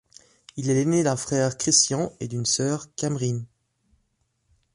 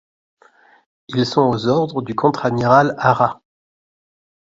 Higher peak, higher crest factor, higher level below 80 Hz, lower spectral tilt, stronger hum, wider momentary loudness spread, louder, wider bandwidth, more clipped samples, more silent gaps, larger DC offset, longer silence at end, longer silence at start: second, -6 dBFS vs 0 dBFS; about the same, 20 dB vs 18 dB; second, -60 dBFS vs -54 dBFS; second, -4 dB/octave vs -7 dB/octave; neither; first, 11 LU vs 7 LU; second, -23 LUFS vs -17 LUFS; first, 11.5 kHz vs 7.8 kHz; neither; neither; neither; first, 1.3 s vs 1.05 s; second, 0.55 s vs 1.1 s